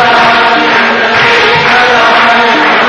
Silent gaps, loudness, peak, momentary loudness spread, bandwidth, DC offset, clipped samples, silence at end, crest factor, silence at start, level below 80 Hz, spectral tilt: none; -5 LUFS; 0 dBFS; 2 LU; 11 kHz; 0.4%; 2%; 0 s; 6 dB; 0 s; -44 dBFS; -3.5 dB/octave